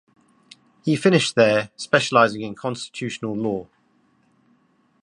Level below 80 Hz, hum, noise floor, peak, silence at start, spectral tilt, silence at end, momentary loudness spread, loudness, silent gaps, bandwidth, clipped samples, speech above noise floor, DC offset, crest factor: -64 dBFS; none; -62 dBFS; -2 dBFS; 0.85 s; -5 dB/octave; 1.4 s; 12 LU; -21 LUFS; none; 11 kHz; under 0.1%; 42 dB; under 0.1%; 20 dB